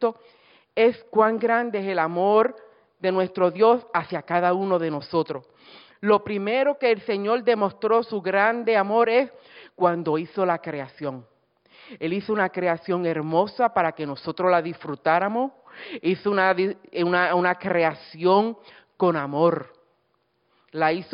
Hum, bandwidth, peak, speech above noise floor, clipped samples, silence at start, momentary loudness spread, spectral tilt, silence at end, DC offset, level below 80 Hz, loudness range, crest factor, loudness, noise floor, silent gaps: none; 5.4 kHz; -6 dBFS; 47 dB; under 0.1%; 0 s; 11 LU; -10.5 dB/octave; 0.1 s; under 0.1%; -72 dBFS; 4 LU; 18 dB; -23 LUFS; -70 dBFS; none